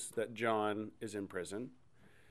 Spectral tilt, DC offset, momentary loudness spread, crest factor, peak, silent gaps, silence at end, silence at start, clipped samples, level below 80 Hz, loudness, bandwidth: -4.5 dB/octave; under 0.1%; 11 LU; 20 dB; -20 dBFS; none; 0.25 s; 0 s; under 0.1%; -76 dBFS; -39 LUFS; 15 kHz